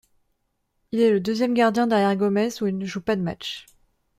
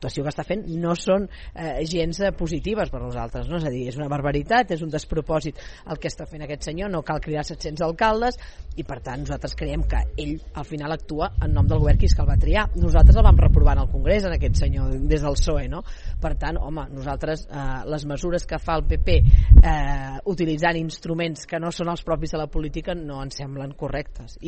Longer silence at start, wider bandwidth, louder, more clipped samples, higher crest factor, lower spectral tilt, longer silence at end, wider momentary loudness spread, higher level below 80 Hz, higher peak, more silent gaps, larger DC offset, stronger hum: first, 0.95 s vs 0 s; first, 15.5 kHz vs 8.4 kHz; about the same, -23 LUFS vs -23 LUFS; neither; about the same, 18 dB vs 20 dB; about the same, -6 dB/octave vs -6.5 dB/octave; first, 0.55 s vs 0 s; second, 10 LU vs 15 LU; second, -60 dBFS vs -22 dBFS; second, -6 dBFS vs 0 dBFS; neither; neither; neither